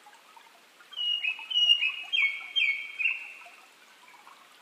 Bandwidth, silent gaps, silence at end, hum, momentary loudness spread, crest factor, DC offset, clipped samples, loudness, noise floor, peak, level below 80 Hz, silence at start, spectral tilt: 15.5 kHz; none; 0.3 s; none; 16 LU; 20 dB; under 0.1%; under 0.1%; -26 LUFS; -56 dBFS; -12 dBFS; under -90 dBFS; 0.05 s; 3.5 dB/octave